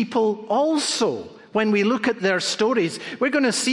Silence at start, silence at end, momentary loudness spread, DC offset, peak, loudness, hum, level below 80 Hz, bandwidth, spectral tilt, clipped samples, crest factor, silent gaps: 0 s; 0 s; 5 LU; under 0.1%; -8 dBFS; -21 LUFS; none; -68 dBFS; 11.5 kHz; -3.5 dB/octave; under 0.1%; 14 dB; none